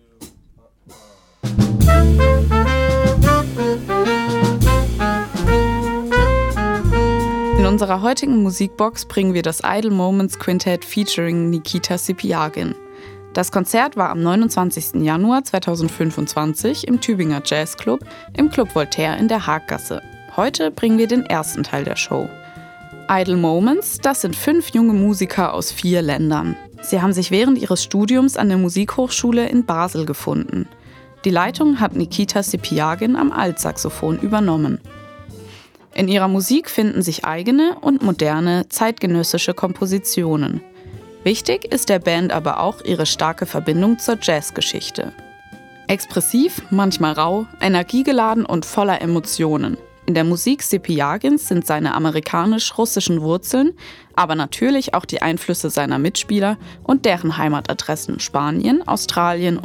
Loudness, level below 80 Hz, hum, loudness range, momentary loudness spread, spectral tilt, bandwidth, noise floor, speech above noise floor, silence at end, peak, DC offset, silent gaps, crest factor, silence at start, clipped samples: -18 LUFS; -30 dBFS; none; 3 LU; 7 LU; -5 dB/octave; 19.5 kHz; -50 dBFS; 32 dB; 0 s; -2 dBFS; under 0.1%; none; 16 dB; 0.2 s; under 0.1%